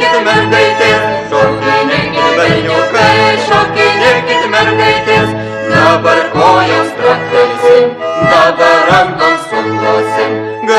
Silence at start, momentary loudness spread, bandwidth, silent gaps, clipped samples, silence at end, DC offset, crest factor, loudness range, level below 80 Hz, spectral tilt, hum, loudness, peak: 0 s; 6 LU; 12.5 kHz; none; 0.8%; 0 s; under 0.1%; 10 dB; 1 LU; -42 dBFS; -4.5 dB/octave; none; -9 LUFS; 0 dBFS